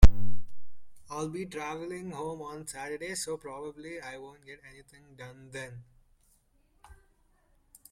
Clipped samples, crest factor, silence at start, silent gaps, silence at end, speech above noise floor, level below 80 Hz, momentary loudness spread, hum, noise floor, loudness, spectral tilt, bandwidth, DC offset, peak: under 0.1%; 24 dB; 0 s; none; 2.25 s; 28 dB; -34 dBFS; 18 LU; none; -68 dBFS; -37 LUFS; -5.5 dB/octave; 16.5 kHz; under 0.1%; -2 dBFS